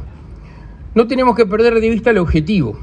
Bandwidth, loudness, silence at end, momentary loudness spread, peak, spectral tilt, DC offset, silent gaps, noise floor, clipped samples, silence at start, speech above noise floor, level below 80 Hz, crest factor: 9.6 kHz; -14 LUFS; 0 s; 5 LU; 0 dBFS; -8 dB/octave; under 0.1%; none; -34 dBFS; under 0.1%; 0 s; 21 dB; -30 dBFS; 14 dB